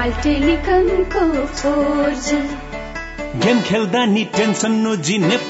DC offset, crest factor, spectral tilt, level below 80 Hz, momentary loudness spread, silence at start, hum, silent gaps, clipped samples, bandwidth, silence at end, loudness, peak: under 0.1%; 14 dB; -5 dB/octave; -32 dBFS; 11 LU; 0 s; none; none; under 0.1%; 8 kHz; 0 s; -17 LUFS; -4 dBFS